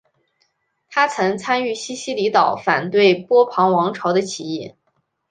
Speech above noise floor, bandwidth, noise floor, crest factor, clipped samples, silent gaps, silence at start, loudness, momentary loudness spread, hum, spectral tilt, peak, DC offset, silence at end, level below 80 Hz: 51 dB; 9.6 kHz; -69 dBFS; 18 dB; under 0.1%; none; 0.9 s; -18 LUFS; 11 LU; none; -4.5 dB/octave; -2 dBFS; under 0.1%; 0.6 s; -66 dBFS